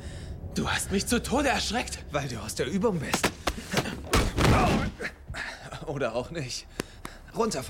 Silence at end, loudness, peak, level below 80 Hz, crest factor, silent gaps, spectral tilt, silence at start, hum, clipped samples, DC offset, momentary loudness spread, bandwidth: 0 s; -28 LUFS; -10 dBFS; -38 dBFS; 18 dB; none; -4.5 dB/octave; 0 s; none; under 0.1%; under 0.1%; 14 LU; 16.5 kHz